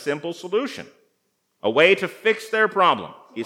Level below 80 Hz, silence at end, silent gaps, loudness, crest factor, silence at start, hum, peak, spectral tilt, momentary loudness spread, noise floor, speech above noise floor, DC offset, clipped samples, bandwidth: -78 dBFS; 0 s; none; -20 LUFS; 22 dB; 0 s; none; 0 dBFS; -4 dB/octave; 14 LU; -71 dBFS; 50 dB; under 0.1%; under 0.1%; 15.5 kHz